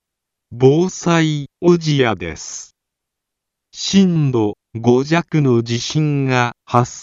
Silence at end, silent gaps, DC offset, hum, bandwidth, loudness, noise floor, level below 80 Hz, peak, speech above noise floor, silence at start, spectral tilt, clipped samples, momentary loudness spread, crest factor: 0 s; none; under 0.1%; none; 7.8 kHz; -16 LUFS; -80 dBFS; -52 dBFS; 0 dBFS; 65 dB; 0.5 s; -6 dB/octave; under 0.1%; 10 LU; 16 dB